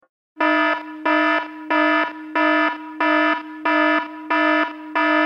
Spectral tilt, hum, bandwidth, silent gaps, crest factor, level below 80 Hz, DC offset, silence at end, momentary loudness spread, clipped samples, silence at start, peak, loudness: -3.5 dB/octave; none; 6.6 kHz; none; 14 dB; -78 dBFS; under 0.1%; 0 s; 6 LU; under 0.1%; 0.35 s; -6 dBFS; -19 LUFS